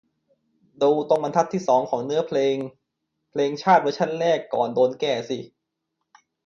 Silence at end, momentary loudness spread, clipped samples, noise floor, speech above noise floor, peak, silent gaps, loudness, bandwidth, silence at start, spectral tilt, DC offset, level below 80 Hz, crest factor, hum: 1 s; 10 LU; under 0.1%; -79 dBFS; 58 dB; -6 dBFS; none; -22 LUFS; 7.4 kHz; 0.8 s; -5.5 dB/octave; under 0.1%; -70 dBFS; 18 dB; none